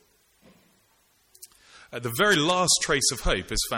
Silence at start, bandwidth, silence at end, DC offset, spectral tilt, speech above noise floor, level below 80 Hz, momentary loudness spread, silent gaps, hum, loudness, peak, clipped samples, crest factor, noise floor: 1.4 s; 17 kHz; 0 s; under 0.1%; -2 dB/octave; 41 dB; -40 dBFS; 13 LU; none; none; -23 LUFS; -6 dBFS; under 0.1%; 20 dB; -65 dBFS